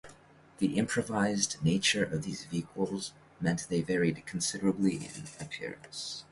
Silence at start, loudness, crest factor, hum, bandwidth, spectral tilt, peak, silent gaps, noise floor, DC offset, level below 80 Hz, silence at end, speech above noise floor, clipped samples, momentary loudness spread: 0.05 s; -32 LUFS; 20 dB; none; 11.5 kHz; -4 dB/octave; -14 dBFS; none; -57 dBFS; under 0.1%; -62 dBFS; 0.1 s; 25 dB; under 0.1%; 12 LU